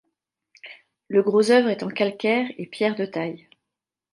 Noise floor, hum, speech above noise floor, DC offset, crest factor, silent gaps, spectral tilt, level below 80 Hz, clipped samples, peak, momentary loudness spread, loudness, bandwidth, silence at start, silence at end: -86 dBFS; none; 64 dB; under 0.1%; 18 dB; none; -5.5 dB/octave; -74 dBFS; under 0.1%; -6 dBFS; 25 LU; -22 LUFS; 11.5 kHz; 0.65 s; 0.75 s